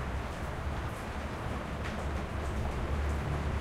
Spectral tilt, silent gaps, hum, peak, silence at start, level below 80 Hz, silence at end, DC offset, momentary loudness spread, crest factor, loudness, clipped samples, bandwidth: -6.5 dB/octave; none; none; -22 dBFS; 0 s; -38 dBFS; 0 s; under 0.1%; 4 LU; 12 dB; -36 LUFS; under 0.1%; 14 kHz